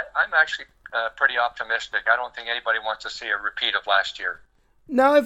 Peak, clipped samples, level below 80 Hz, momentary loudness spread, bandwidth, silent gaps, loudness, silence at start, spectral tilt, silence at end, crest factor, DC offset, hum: -4 dBFS; under 0.1%; -60 dBFS; 10 LU; 14 kHz; none; -23 LUFS; 0 s; -2 dB/octave; 0 s; 20 dB; under 0.1%; none